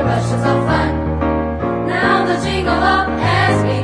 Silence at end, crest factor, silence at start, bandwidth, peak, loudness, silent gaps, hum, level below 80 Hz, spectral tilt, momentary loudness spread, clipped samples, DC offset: 0 s; 14 dB; 0 s; 10.5 kHz; -2 dBFS; -16 LUFS; none; none; -30 dBFS; -6.5 dB/octave; 4 LU; under 0.1%; under 0.1%